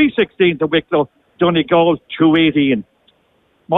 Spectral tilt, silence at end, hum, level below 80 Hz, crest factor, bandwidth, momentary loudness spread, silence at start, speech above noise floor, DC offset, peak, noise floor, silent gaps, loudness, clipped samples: -9.5 dB/octave; 0 s; none; -52 dBFS; 14 dB; 4 kHz; 6 LU; 0 s; 44 dB; under 0.1%; -2 dBFS; -59 dBFS; none; -15 LUFS; under 0.1%